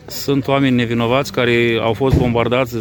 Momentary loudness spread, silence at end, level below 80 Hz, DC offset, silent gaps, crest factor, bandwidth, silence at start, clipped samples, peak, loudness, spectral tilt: 2 LU; 0 s; -34 dBFS; under 0.1%; none; 16 dB; over 20 kHz; 0.05 s; under 0.1%; 0 dBFS; -16 LUFS; -6 dB/octave